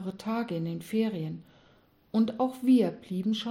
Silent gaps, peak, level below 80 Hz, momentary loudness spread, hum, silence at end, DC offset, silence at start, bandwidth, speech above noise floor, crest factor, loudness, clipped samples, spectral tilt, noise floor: none; -14 dBFS; -72 dBFS; 11 LU; none; 0 s; under 0.1%; 0 s; 16 kHz; 34 dB; 16 dB; -29 LUFS; under 0.1%; -7 dB/octave; -62 dBFS